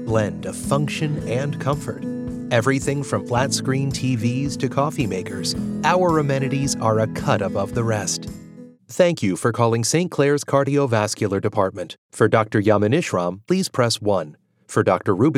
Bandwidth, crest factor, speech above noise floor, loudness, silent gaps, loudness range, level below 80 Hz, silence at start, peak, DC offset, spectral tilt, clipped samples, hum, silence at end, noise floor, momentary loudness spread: 15.5 kHz; 18 dB; 22 dB; -21 LUFS; 11.98-12.09 s; 3 LU; -48 dBFS; 0 s; -4 dBFS; under 0.1%; -5.5 dB/octave; under 0.1%; none; 0 s; -42 dBFS; 7 LU